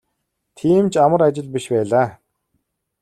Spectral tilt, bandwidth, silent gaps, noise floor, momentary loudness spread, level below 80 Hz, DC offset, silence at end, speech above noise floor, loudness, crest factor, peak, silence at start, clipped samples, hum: -7 dB/octave; 12.5 kHz; none; -74 dBFS; 10 LU; -58 dBFS; under 0.1%; 0.9 s; 58 dB; -17 LUFS; 16 dB; -2 dBFS; 0.65 s; under 0.1%; none